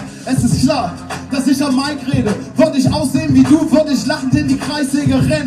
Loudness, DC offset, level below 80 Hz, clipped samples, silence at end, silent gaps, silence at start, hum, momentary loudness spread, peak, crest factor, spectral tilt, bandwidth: -15 LUFS; under 0.1%; -38 dBFS; under 0.1%; 0 s; none; 0 s; none; 7 LU; 0 dBFS; 14 dB; -6 dB/octave; 13 kHz